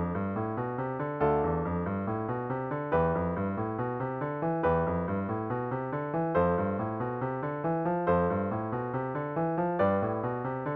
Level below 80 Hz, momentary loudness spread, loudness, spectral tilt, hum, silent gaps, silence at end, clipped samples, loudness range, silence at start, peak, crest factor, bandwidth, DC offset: -52 dBFS; 6 LU; -31 LUFS; -8.5 dB/octave; none; none; 0 s; under 0.1%; 1 LU; 0 s; -14 dBFS; 16 dB; 4.4 kHz; under 0.1%